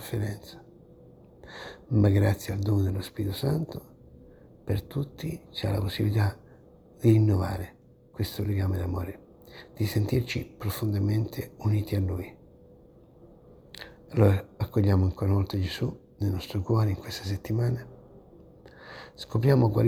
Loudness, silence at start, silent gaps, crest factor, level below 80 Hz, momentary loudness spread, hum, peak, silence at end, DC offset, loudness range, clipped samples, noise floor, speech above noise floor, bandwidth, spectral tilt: -28 LUFS; 0 s; none; 20 dB; -50 dBFS; 21 LU; none; -8 dBFS; 0 s; under 0.1%; 4 LU; under 0.1%; -54 dBFS; 28 dB; 18.5 kHz; -7.5 dB/octave